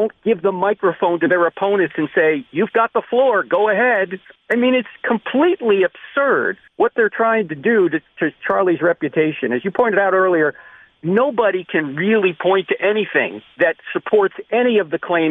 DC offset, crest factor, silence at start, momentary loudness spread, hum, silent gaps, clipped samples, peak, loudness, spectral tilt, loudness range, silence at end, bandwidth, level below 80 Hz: under 0.1%; 14 dB; 0 s; 5 LU; none; none; under 0.1%; -2 dBFS; -17 LUFS; -8 dB/octave; 1 LU; 0 s; 3.9 kHz; -64 dBFS